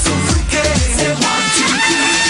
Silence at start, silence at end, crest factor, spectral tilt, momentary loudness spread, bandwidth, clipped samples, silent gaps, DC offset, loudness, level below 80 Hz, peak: 0 s; 0 s; 10 dB; -2.5 dB/octave; 3 LU; 13 kHz; under 0.1%; none; under 0.1%; -13 LUFS; -24 dBFS; -4 dBFS